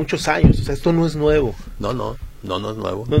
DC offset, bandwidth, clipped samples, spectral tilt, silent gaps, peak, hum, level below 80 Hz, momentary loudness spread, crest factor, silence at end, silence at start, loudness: under 0.1%; 15 kHz; under 0.1%; -6.5 dB/octave; none; 0 dBFS; none; -28 dBFS; 12 LU; 18 dB; 0 s; 0 s; -20 LUFS